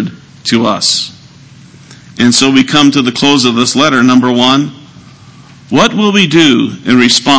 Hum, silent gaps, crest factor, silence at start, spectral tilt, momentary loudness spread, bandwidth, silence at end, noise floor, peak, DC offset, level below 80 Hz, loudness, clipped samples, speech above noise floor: none; none; 10 dB; 0 s; -3.5 dB/octave; 8 LU; 8 kHz; 0 s; -36 dBFS; 0 dBFS; under 0.1%; -48 dBFS; -8 LUFS; 1%; 28 dB